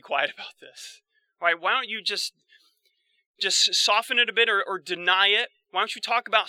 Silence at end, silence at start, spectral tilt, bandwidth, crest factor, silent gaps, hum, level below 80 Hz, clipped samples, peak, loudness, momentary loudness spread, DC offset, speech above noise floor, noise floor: 0 s; 0.05 s; 0.5 dB/octave; 17.5 kHz; 20 dB; 3.26-3.34 s; none; under -90 dBFS; under 0.1%; -4 dBFS; -23 LUFS; 21 LU; under 0.1%; 45 dB; -70 dBFS